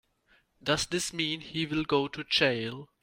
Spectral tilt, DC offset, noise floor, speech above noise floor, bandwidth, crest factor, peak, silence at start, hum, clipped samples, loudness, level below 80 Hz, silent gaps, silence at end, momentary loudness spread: -3.5 dB/octave; under 0.1%; -68 dBFS; 37 dB; 16 kHz; 22 dB; -10 dBFS; 0.65 s; none; under 0.1%; -29 LUFS; -58 dBFS; none; 0.15 s; 8 LU